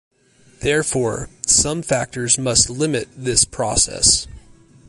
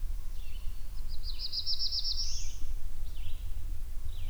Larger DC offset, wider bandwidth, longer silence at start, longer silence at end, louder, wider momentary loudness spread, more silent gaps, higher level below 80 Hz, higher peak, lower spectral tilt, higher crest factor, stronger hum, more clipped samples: neither; first, 11.5 kHz vs 7.4 kHz; first, 0.6 s vs 0 s; first, 0.5 s vs 0 s; first, -17 LUFS vs -37 LUFS; second, 10 LU vs 14 LU; neither; second, -40 dBFS vs -34 dBFS; first, 0 dBFS vs -18 dBFS; about the same, -2.5 dB/octave vs -2 dB/octave; first, 20 dB vs 10 dB; neither; neither